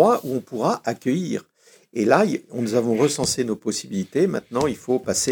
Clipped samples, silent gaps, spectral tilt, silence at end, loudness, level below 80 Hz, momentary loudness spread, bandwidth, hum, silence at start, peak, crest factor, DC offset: under 0.1%; none; -4.5 dB/octave; 0 s; -22 LUFS; -58 dBFS; 8 LU; over 20 kHz; none; 0 s; -2 dBFS; 18 dB; under 0.1%